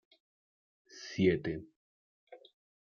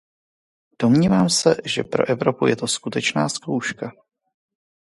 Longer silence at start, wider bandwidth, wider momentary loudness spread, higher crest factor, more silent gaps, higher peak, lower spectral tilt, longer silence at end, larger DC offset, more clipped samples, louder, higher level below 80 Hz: first, 0.95 s vs 0.8 s; second, 7 kHz vs 11.5 kHz; first, 20 LU vs 9 LU; about the same, 22 dB vs 20 dB; first, 1.76-2.27 s vs none; second, -16 dBFS vs -2 dBFS; first, -6.5 dB/octave vs -4.5 dB/octave; second, 0.45 s vs 1.05 s; neither; neither; second, -33 LUFS vs -20 LUFS; second, -66 dBFS vs -56 dBFS